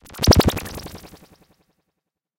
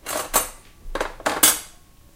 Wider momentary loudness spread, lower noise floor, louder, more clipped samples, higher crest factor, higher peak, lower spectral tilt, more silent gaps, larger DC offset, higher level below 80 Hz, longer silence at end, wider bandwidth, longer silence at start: first, 23 LU vs 15 LU; first, -79 dBFS vs -48 dBFS; about the same, -18 LUFS vs -20 LUFS; neither; about the same, 22 dB vs 24 dB; about the same, -2 dBFS vs 0 dBFS; first, -5 dB/octave vs 0 dB/octave; neither; neither; first, -32 dBFS vs -40 dBFS; first, 1.35 s vs 0.45 s; about the same, 17 kHz vs 17 kHz; about the same, 0.15 s vs 0.05 s